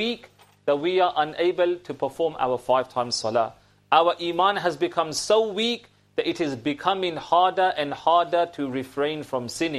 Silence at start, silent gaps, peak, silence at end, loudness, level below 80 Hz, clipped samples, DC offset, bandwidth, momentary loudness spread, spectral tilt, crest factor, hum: 0 s; none; -4 dBFS; 0 s; -24 LUFS; -64 dBFS; under 0.1%; under 0.1%; 13.5 kHz; 9 LU; -4 dB/octave; 20 dB; none